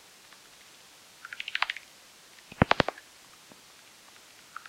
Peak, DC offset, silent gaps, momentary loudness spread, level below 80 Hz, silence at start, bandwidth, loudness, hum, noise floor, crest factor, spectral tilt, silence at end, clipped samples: -6 dBFS; under 0.1%; none; 25 LU; -54 dBFS; 1.3 s; 16.5 kHz; -29 LUFS; none; -54 dBFS; 30 dB; -4.5 dB/octave; 1.75 s; under 0.1%